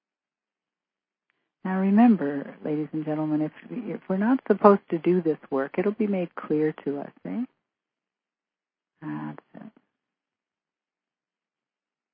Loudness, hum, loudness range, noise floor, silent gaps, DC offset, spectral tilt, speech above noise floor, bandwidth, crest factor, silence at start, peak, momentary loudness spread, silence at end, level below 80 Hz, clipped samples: -25 LUFS; none; 19 LU; under -90 dBFS; none; under 0.1%; -12 dB/octave; over 65 dB; 5 kHz; 24 dB; 1.65 s; -2 dBFS; 17 LU; 2.45 s; -78 dBFS; under 0.1%